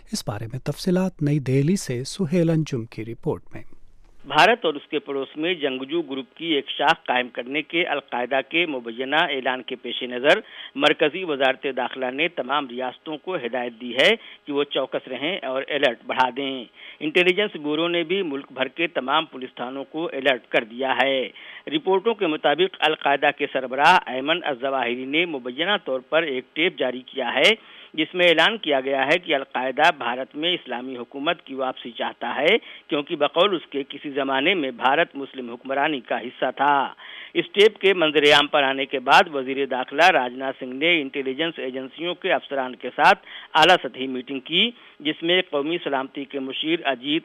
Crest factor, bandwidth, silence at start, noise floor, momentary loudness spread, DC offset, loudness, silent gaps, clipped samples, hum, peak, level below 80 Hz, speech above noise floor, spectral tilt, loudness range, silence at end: 18 dB; 15 kHz; 0.1 s; -43 dBFS; 12 LU; under 0.1%; -22 LUFS; none; under 0.1%; none; -4 dBFS; -58 dBFS; 20 dB; -4.5 dB/octave; 5 LU; 0.05 s